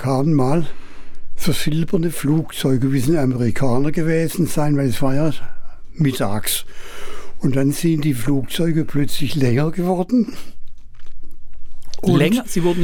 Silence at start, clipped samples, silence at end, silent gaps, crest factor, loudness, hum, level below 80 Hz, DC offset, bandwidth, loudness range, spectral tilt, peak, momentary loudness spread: 0 s; under 0.1%; 0 s; none; 14 dB; -19 LUFS; none; -34 dBFS; under 0.1%; 18 kHz; 3 LU; -6 dB/octave; -2 dBFS; 7 LU